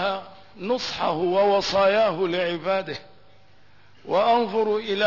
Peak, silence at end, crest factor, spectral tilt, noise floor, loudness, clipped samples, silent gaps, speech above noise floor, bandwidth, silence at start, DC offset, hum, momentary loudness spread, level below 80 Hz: -10 dBFS; 0 s; 14 dB; -4.5 dB/octave; -56 dBFS; -23 LUFS; under 0.1%; none; 34 dB; 6 kHz; 0 s; 0.3%; none; 10 LU; -62 dBFS